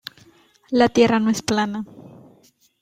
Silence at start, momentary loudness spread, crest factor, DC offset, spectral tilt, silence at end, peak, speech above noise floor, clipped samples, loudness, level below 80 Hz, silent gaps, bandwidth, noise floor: 0.7 s; 19 LU; 20 dB; under 0.1%; -4.5 dB/octave; 0.75 s; -2 dBFS; 38 dB; under 0.1%; -19 LUFS; -56 dBFS; none; 16 kHz; -57 dBFS